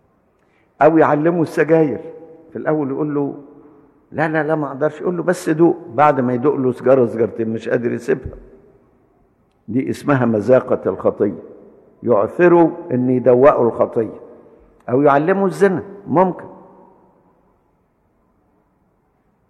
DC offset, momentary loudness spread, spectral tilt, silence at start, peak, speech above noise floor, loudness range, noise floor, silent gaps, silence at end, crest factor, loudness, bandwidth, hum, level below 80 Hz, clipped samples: under 0.1%; 12 LU; -8 dB/octave; 0.8 s; -2 dBFS; 45 dB; 6 LU; -61 dBFS; none; 2.95 s; 16 dB; -17 LUFS; 12.5 kHz; none; -54 dBFS; under 0.1%